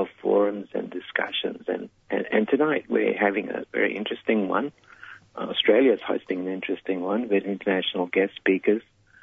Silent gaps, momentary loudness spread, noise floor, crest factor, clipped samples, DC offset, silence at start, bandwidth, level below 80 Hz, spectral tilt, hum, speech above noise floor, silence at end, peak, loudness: none; 10 LU; -47 dBFS; 18 dB; under 0.1%; under 0.1%; 0 s; 3.9 kHz; -70 dBFS; -7.5 dB/octave; none; 22 dB; 0.4 s; -6 dBFS; -25 LUFS